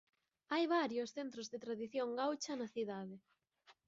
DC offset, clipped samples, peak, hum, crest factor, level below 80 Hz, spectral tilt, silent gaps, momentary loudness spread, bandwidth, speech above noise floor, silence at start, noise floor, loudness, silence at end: under 0.1%; under 0.1%; -24 dBFS; none; 18 dB; -88 dBFS; -3 dB/octave; none; 11 LU; 7.4 kHz; 31 dB; 0.5 s; -71 dBFS; -41 LUFS; 0.15 s